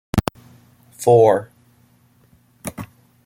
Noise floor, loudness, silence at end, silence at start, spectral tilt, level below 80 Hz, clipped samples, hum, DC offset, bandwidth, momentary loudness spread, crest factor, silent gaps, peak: -56 dBFS; -17 LUFS; 0.4 s; 0.15 s; -6.5 dB/octave; -44 dBFS; under 0.1%; none; under 0.1%; 16.5 kHz; 22 LU; 20 dB; none; -2 dBFS